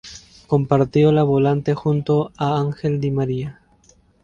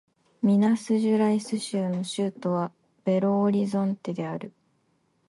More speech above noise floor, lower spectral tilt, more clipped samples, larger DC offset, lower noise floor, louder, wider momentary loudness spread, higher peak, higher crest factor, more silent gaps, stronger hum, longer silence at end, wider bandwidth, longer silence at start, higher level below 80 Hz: second, 37 dB vs 45 dB; first, -8.5 dB/octave vs -7 dB/octave; neither; neither; second, -55 dBFS vs -69 dBFS; first, -19 LUFS vs -26 LUFS; second, 8 LU vs 11 LU; first, -2 dBFS vs -12 dBFS; about the same, 18 dB vs 14 dB; neither; neither; about the same, 0.7 s vs 0.8 s; second, 7.2 kHz vs 11.5 kHz; second, 0.05 s vs 0.4 s; first, -50 dBFS vs -72 dBFS